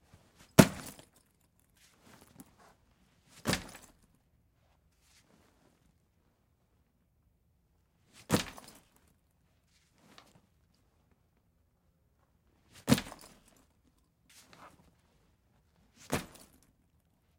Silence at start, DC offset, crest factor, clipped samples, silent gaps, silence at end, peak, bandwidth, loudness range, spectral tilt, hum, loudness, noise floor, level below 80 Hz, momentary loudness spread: 0.6 s; under 0.1%; 34 dB; under 0.1%; none; 1.15 s; -6 dBFS; 16.5 kHz; 11 LU; -5 dB/octave; none; -31 LUFS; -73 dBFS; -62 dBFS; 32 LU